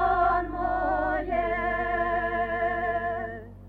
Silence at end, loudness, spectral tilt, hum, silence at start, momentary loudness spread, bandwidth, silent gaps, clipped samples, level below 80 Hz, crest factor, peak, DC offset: 0 s; -27 LUFS; -8 dB/octave; none; 0 s; 5 LU; 4.7 kHz; none; under 0.1%; -42 dBFS; 14 dB; -12 dBFS; under 0.1%